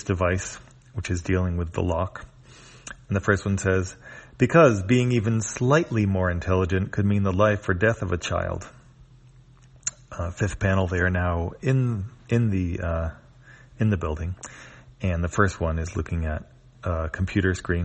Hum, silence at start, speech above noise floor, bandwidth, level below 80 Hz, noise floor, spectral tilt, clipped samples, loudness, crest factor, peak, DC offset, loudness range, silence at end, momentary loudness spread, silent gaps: none; 0 s; 28 dB; 8.4 kHz; -40 dBFS; -51 dBFS; -6.5 dB/octave; under 0.1%; -25 LUFS; 22 dB; -4 dBFS; under 0.1%; 6 LU; 0 s; 14 LU; none